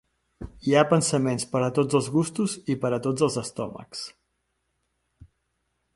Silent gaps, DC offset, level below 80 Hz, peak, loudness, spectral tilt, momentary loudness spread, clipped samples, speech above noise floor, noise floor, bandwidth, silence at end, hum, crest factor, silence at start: none; under 0.1%; -56 dBFS; -4 dBFS; -25 LUFS; -5.5 dB/octave; 15 LU; under 0.1%; 51 dB; -76 dBFS; 11.5 kHz; 1.85 s; none; 22 dB; 0.4 s